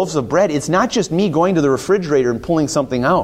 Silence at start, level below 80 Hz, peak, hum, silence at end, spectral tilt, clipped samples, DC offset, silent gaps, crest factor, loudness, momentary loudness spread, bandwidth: 0 s; -46 dBFS; -2 dBFS; none; 0 s; -5.5 dB/octave; under 0.1%; under 0.1%; none; 12 dB; -16 LUFS; 2 LU; 15 kHz